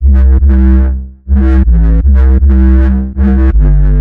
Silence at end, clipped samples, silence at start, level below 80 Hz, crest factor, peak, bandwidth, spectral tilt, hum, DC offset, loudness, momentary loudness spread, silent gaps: 0 s; under 0.1%; 0 s; -6 dBFS; 6 dB; 0 dBFS; 2.6 kHz; -11.5 dB/octave; none; under 0.1%; -9 LUFS; 4 LU; none